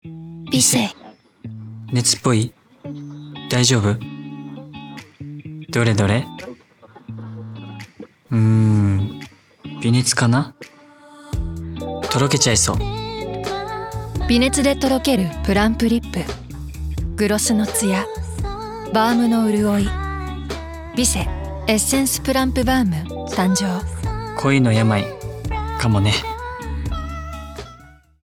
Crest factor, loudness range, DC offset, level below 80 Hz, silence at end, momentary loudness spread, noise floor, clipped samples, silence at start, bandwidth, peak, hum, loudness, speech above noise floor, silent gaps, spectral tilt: 18 dB; 4 LU; under 0.1%; -34 dBFS; 0.35 s; 19 LU; -47 dBFS; under 0.1%; 0.05 s; 19 kHz; -4 dBFS; none; -19 LUFS; 30 dB; none; -4.5 dB/octave